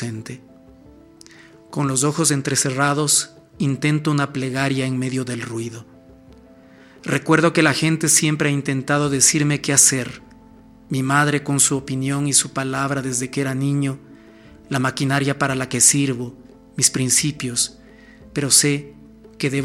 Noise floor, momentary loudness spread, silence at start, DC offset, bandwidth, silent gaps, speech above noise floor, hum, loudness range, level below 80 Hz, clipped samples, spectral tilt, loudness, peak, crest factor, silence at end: -47 dBFS; 14 LU; 0 s; under 0.1%; 16 kHz; none; 27 dB; none; 6 LU; -56 dBFS; under 0.1%; -3.5 dB/octave; -18 LUFS; 0 dBFS; 20 dB; 0 s